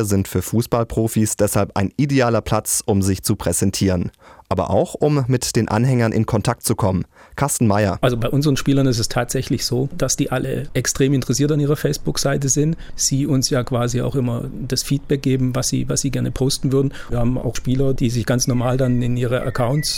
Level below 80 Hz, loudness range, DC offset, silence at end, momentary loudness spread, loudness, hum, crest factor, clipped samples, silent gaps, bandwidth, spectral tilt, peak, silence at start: -36 dBFS; 1 LU; under 0.1%; 0 s; 5 LU; -19 LUFS; none; 14 dB; under 0.1%; none; 18 kHz; -5 dB/octave; -4 dBFS; 0 s